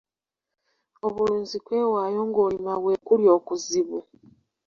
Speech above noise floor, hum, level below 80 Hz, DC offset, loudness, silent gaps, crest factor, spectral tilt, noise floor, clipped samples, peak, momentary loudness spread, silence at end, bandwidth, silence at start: 64 dB; none; -64 dBFS; under 0.1%; -24 LUFS; none; 18 dB; -5 dB/octave; -87 dBFS; under 0.1%; -6 dBFS; 11 LU; 0.65 s; 7.4 kHz; 1.05 s